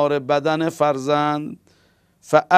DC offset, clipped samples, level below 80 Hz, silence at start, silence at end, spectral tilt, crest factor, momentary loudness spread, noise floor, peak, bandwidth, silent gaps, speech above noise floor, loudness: under 0.1%; under 0.1%; -62 dBFS; 0 s; 0 s; -5.5 dB/octave; 20 dB; 6 LU; -59 dBFS; 0 dBFS; 15 kHz; none; 41 dB; -20 LUFS